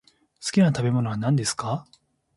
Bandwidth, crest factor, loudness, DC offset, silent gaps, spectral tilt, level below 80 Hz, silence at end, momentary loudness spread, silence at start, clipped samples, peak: 11.5 kHz; 16 dB; -24 LUFS; under 0.1%; none; -5.5 dB/octave; -60 dBFS; 0.55 s; 11 LU; 0.4 s; under 0.1%; -8 dBFS